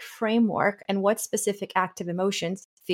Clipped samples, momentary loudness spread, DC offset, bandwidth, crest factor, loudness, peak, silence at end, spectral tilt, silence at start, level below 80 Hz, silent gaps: under 0.1%; 6 LU; under 0.1%; 17 kHz; 18 dB; -26 LUFS; -8 dBFS; 0 s; -4.5 dB/octave; 0 s; -72 dBFS; 2.65-2.77 s